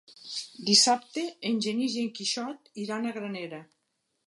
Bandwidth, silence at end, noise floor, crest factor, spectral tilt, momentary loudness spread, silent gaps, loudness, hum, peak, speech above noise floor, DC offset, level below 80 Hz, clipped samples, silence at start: 11.5 kHz; 0.65 s; -78 dBFS; 24 dB; -2 dB/octave; 18 LU; none; -27 LUFS; none; -6 dBFS; 49 dB; under 0.1%; -82 dBFS; under 0.1%; 0.1 s